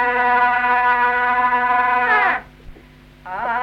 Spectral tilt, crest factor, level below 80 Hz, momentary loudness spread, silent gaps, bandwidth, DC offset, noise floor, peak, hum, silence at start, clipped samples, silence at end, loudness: -4.5 dB/octave; 14 dB; -48 dBFS; 9 LU; none; 6.2 kHz; under 0.1%; -45 dBFS; -4 dBFS; none; 0 s; under 0.1%; 0 s; -16 LUFS